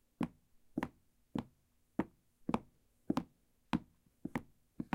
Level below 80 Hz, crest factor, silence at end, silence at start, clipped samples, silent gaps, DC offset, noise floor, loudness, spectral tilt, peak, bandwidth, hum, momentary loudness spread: -64 dBFS; 28 dB; 0.1 s; 0.2 s; under 0.1%; none; under 0.1%; -74 dBFS; -43 LUFS; -7 dB/octave; -16 dBFS; 16 kHz; none; 8 LU